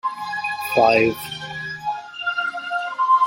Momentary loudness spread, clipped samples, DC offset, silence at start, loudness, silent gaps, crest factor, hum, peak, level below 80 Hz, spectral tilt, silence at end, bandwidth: 13 LU; under 0.1%; under 0.1%; 0.05 s; -22 LUFS; none; 18 dB; none; -2 dBFS; -60 dBFS; -4.5 dB/octave; 0 s; 16.5 kHz